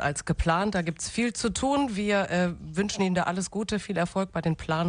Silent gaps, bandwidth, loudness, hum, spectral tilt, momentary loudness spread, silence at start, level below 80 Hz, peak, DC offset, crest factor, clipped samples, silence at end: none; 10 kHz; -27 LUFS; none; -5 dB/octave; 5 LU; 0 s; -44 dBFS; -10 dBFS; under 0.1%; 16 dB; under 0.1%; 0 s